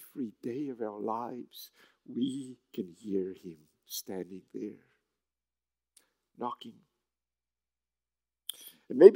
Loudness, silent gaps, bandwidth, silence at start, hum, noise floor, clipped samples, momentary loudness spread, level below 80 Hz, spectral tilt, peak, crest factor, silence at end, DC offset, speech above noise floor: -35 LUFS; none; 16 kHz; 0 s; 60 Hz at -75 dBFS; under -90 dBFS; under 0.1%; 13 LU; -86 dBFS; -5.5 dB/octave; -4 dBFS; 28 dB; 0 s; under 0.1%; over 60 dB